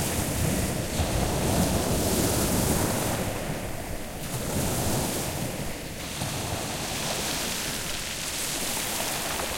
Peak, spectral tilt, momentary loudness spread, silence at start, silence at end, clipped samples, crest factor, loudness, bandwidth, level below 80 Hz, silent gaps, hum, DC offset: -12 dBFS; -3.5 dB/octave; 9 LU; 0 s; 0 s; under 0.1%; 16 dB; -28 LUFS; 16.5 kHz; -40 dBFS; none; none; under 0.1%